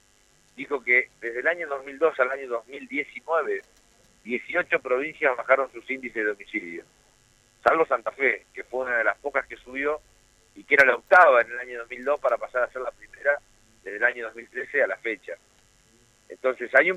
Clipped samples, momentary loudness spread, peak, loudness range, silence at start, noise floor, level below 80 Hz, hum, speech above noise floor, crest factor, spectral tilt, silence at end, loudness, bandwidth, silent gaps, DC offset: under 0.1%; 16 LU; -4 dBFS; 7 LU; 0.6 s; -61 dBFS; -64 dBFS; none; 36 dB; 22 dB; -4 dB/octave; 0 s; -24 LUFS; 12 kHz; none; under 0.1%